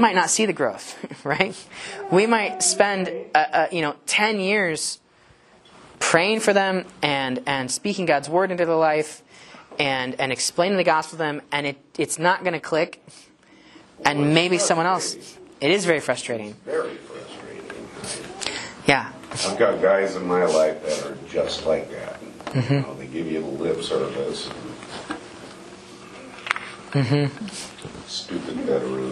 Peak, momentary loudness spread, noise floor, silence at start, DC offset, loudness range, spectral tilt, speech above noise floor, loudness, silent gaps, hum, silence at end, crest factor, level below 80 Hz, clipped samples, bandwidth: 0 dBFS; 17 LU; -54 dBFS; 0 s; under 0.1%; 7 LU; -3.5 dB/octave; 32 dB; -22 LUFS; none; none; 0 s; 24 dB; -60 dBFS; under 0.1%; 12.5 kHz